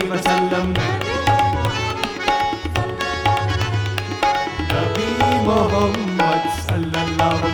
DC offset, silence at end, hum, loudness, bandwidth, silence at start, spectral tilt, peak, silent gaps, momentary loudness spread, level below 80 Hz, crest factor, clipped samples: under 0.1%; 0 s; none; -19 LUFS; over 20 kHz; 0 s; -5.5 dB/octave; -2 dBFS; none; 5 LU; -36 dBFS; 18 dB; under 0.1%